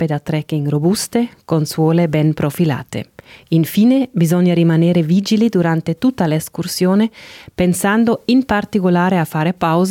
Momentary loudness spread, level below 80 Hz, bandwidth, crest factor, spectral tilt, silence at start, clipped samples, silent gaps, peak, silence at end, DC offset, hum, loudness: 7 LU; -50 dBFS; 17 kHz; 12 dB; -6.5 dB/octave; 0 s; under 0.1%; none; -4 dBFS; 0 s; under 0.1%; none; -16 LUFS